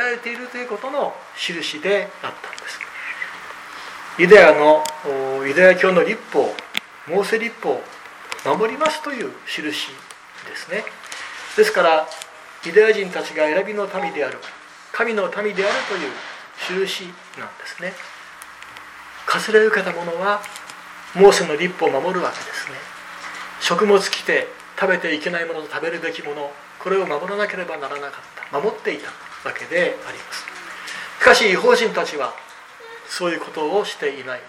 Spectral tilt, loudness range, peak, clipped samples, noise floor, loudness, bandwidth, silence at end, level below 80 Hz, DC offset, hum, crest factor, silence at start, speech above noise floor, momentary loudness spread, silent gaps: -3.5 dB/octave; 10 LU; 0 dBFS; under 0.1%; -40 dBFS; -19 LUFS; 15 kHz; 0 s; -62 dBFS; under 0.1%; none; 20 dB; 0 s; 21 dB; 20 LU; none